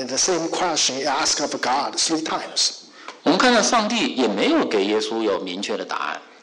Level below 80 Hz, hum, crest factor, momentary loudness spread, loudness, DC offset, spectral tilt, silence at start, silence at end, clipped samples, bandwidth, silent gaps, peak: -60 dBFS; none; 14 dB; 9 LU; -20 LUFS; under 0.1%; -2 dB/octave; 0 s; 0.2 s; under 0.1%; 11 kHz; none; -8 dBFS